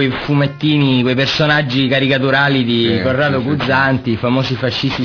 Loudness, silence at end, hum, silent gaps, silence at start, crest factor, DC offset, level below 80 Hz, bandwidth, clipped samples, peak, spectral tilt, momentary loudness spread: -14 LUFS; 0 s; none; none; 0 s; 12 dB; under 0.1%; -44 dBFS; 5.4 kHz; under 0.1%; -2 dBFS; -6.5 dB/octave; 4 LU